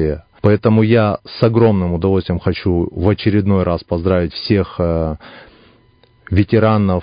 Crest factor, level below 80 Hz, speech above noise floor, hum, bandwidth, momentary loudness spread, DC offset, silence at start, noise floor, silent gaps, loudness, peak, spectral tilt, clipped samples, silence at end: 16 dB; -30 dBFS; 37 dB; none; 5.2 kHz; 6 LU; under 0.1%; 0 s; -52 dBFS; none; -16 LUFS; 0 dBFS; -11 dB/octave; under 0.1%; 0 s